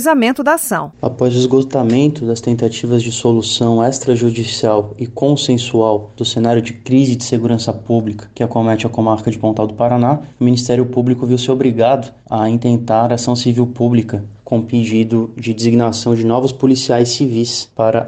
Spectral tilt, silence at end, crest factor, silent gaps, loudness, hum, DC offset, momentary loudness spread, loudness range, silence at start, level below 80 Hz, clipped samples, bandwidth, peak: -6 dB/octave; 0 s; 14 dB; none; -14 LUFS; none; under 0.1%; 5 LU; 1 LU; 0 s; -50 dBFS; under 0.1%; 15 kHz; 0 dBFS